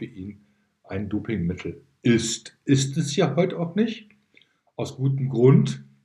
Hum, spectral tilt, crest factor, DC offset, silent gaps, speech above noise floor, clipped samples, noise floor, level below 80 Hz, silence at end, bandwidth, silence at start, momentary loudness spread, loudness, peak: none; -6 dB/octave; 18 dB; under 0.1%; none; 38 dB; under 0.1%; -61 dBFS; -58 dBFS; 0.2 s; 11.5 kHz; 0 s; 18 LU; -23 LUFS; -6 dBFS